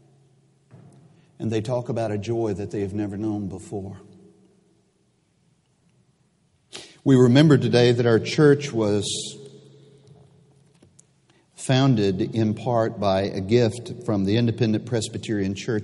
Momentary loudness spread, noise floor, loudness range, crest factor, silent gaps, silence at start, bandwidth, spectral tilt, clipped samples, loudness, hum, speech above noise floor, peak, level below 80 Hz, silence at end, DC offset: 16 LU; -65 dBFS; 13 LU; 20 dB; none; 1.4 s; 11.5 kHz; -6.5 dB/octave; under 0.1%; -22 LUFS; none; 44 dB; -2 dBFS; -60 dBFS; 0 s; under 0.1%